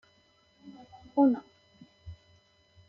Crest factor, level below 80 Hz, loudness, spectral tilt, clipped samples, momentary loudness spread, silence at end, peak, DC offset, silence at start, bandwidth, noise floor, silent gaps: 20 dB; -64 dBFS; -28 LUFS; -7.5 dB/octave; under 0.1%; 27 LU; 0.75 s; -14 dBFS; under 0.1%; 0.65 s; 5.4 kHz; -66 dBFS; none